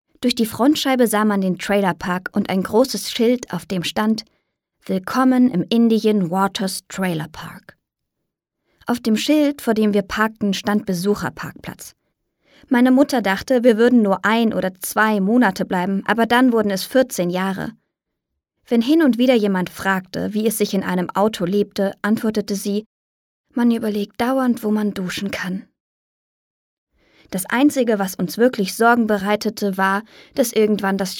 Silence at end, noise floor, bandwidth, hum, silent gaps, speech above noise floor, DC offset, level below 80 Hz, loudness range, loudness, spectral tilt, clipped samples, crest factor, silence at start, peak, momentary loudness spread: 0 s; -79 dBFS; 18 kHz; none; 22.86-23.44 s, 25.80-26.87 s; 61 dB; under 0.1%; -56 dBFS; 5 LU; -19 LUFS; -5 dB/octave; under 0.1%; 18 dB; 0.2 s; -2 dBFS; 10 LU